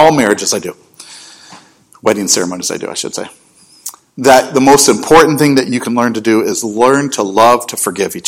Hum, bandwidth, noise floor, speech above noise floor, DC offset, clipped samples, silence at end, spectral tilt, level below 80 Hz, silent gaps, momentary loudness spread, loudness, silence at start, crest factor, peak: none; over 20 kHz; -41 dBFS; 30 dB; under 0.1%; 2%; 0 s; -3.5 dB/octave; -46 dBFS; none; 20 LU; -11 LUFS; 0 s; 12 dB; 0 dBFS